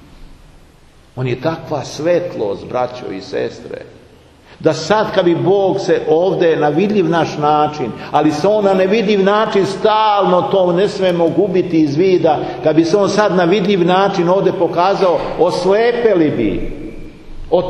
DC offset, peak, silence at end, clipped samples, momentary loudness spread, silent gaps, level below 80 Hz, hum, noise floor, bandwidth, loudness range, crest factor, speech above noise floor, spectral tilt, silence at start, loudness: under 0.1%; 0 dBFS; 0 s; under 0.1%; 10 LU; none; -38 dBFS; none; -45 dBFS; 10 kHz; 7 LU; 14 dB; 31 dB; -6.5 dB/octave; 0.15 s; -14 LUFS